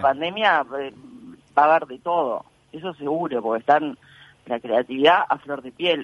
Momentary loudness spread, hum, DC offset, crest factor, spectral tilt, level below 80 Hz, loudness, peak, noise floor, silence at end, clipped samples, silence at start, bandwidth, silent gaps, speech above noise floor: 15 LU; none; under 0.1%; 20 dB; -5.5 dB/octave; -68 dBFS; -22 LUFS; -2 dBFS; -44 dBFS; 0 s; under 0.1%; 0 s; 11 kHz; none; 23 dB